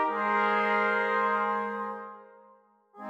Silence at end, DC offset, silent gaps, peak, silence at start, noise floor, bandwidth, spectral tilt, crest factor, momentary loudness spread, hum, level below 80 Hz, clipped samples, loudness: 0 s; under 0.1%; none; -14 dBFS; 0 s; -60 dBFS; 8.4 kHz; -5.5 dB/octave; 16 dB; 12 LU; none; -88 dBFS; under 0.1%; -27 LUFS